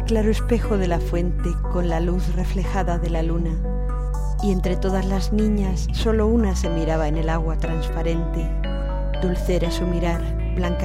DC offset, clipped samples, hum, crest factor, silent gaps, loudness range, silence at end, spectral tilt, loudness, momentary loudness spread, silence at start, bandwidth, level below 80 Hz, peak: under 0.1%; under 0.1%; none; 14 dB; none; 2 LU; 0 s; -7 dB/octave; -23 LUFS; 5 LU; 0 s; 12 kHz; -22 dBFS; -6 dBFS